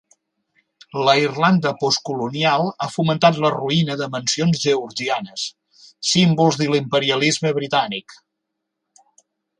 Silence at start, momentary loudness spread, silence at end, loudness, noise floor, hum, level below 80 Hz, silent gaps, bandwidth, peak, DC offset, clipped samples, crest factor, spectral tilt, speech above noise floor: 0.95 s; 9 LU; 1.45 s; -19 LUFS; -79 dBFS; none; -62 dBFS; none; 11 kHz; 0 dBFS; under 0.1%; under 0.1%; 20 dB; -4.5 dB/octave; 60 dB